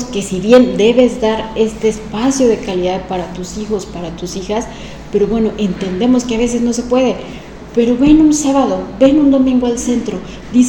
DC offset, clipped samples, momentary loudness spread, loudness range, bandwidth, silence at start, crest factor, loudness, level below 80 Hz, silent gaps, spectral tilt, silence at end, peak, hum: under 0.1%; 0.3%; 14 LU; 6 LU; 12 kHz; 0 s; 14 dB; -14 LUFS; -34 dBFS; none; -5 dB/octave; 0 s; 0 dBFS; none